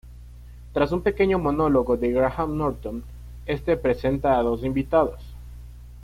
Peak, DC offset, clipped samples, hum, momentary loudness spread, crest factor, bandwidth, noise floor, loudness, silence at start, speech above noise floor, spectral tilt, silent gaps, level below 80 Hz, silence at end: -6 dBFS; under 0.1%; under 0.1%; 60 Hz at -40 dBFS; 20 LU; 18 dB; 15.5 kHz; -42 dBFS; -23 LUFS; 0.05 s; 20 dB; -8.5 dB/octave; none; -38 dBFS; 0 s